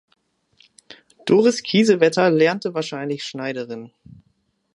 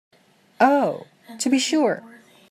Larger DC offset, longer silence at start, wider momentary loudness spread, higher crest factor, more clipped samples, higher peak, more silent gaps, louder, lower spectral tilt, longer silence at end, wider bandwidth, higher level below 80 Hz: neither; first, 1.25 s vs 0.6 s; first, 14 LU vs 11 LU; about the same, 20 dB vs 18 dB; neither; about the same, -2 dBFS vs -4 dBFS; neither; about the same, -19 LUFS vs -21 LUFS; first, -5 dB/octave vs -3.5 dB/octave; first, 0.9 s vs 0.45 s; second, 11.5 kHz vs 15.5 kHz; first, -68 dBFS vs -78 dBFS